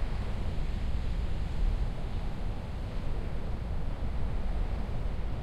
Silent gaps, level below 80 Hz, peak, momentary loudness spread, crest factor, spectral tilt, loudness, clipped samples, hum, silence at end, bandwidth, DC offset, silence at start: none; -32 dBFS; -18 dBFS; 4 LU; 12 dB; -7.5 dB/octave; -37 LUFS; under 0.1%; none; 0 s; 8.8 kHz; under 0.1%; 0 s